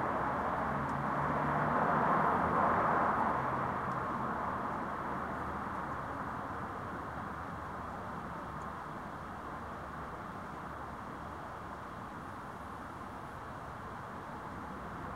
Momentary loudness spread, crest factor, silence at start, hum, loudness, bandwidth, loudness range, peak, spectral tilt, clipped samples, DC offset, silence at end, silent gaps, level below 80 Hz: 14 LU; 18 dB; 0 s; none; -37 LUFS; 16 kHz; 13 LU; -18 dBFS; -7 dB/octave; under 0.1%; under 0.1%; 0 s; none; -56 dBFS